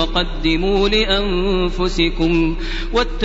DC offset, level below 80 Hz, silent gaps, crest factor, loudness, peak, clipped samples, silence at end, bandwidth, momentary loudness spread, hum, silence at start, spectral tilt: under 0.1%; -22 dBFS; none; 14 dB; -18 LUFS; -2 dBFS; under 0.1%; 0 s; 8 kHz; 5 LU; none; 0 s; -3.5 dB/octave